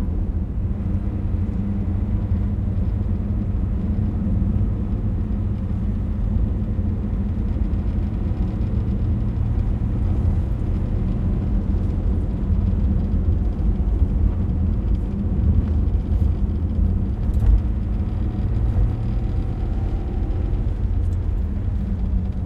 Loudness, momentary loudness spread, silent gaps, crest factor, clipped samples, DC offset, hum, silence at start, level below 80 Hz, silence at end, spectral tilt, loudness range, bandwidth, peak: -23 LUFS; 3 LU; none; 14 dB; under 0.1%; under 0.1%; none; 0 s; -24 dBFS; 0 s; -10.5 dB/octave; 2 LU; 3.9 kHz; -6 dBFS